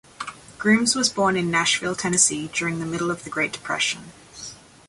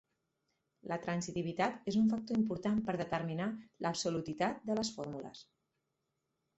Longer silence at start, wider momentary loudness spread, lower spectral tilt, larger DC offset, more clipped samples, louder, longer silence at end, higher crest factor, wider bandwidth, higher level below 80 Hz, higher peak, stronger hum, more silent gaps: second, 0.2 s vs 0.85 s; first, 18 LU vs 11 LU; second, -2.5 dB/octave vs -5.5 dB/octave; neither; neither; first, -21 LUFS vs -36 LUFS; second, 0.35 s vs 1.15 s; about the same, 20 dB vs 18 dB; first, 11.5 kHz vs 8.2 kHz; first, -58 dBFS vs -70 dBFS; first, -4 dBFS vs -18 dBFS; neither; neither